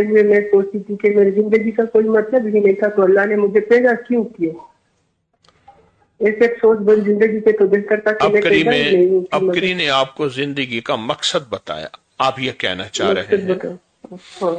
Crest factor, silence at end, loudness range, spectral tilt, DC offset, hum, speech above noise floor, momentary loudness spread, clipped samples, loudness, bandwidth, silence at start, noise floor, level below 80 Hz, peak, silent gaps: 12 dB; 0 s; 6 LU; -5 dB/octave; under 0.1%; none; 49 dB; 9 LU; under 0.1%; -16 LUFS; 9.2 kHz; 0 s; -65 dBFS; -58 dBFS; -4 dBFS; none